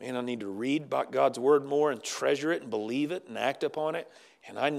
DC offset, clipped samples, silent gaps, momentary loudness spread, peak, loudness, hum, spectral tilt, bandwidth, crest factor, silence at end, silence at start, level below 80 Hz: under 0.1%; under 0.1%; none; 9 LU; -12 dBFS; -30 LUFS; none; -4.5 dB/octave; 13.5 kHz; 18 dB; 0 s; 0 s; -90 dBFS